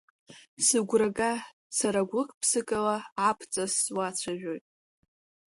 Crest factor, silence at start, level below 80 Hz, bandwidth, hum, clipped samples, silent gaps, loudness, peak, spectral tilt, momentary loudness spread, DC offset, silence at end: 20 dB; 0.3 s; -68 dBFS; 12 kHz; none; under 0.1%; 0.48-0.57 s, 1.53-1.70 s, 2.34-2.41 s, 3.12-3.16 s; -28 LUFS; -10 dBFS; -2.5 dB/octave; 9 LU; under 0.1%; 0.9 s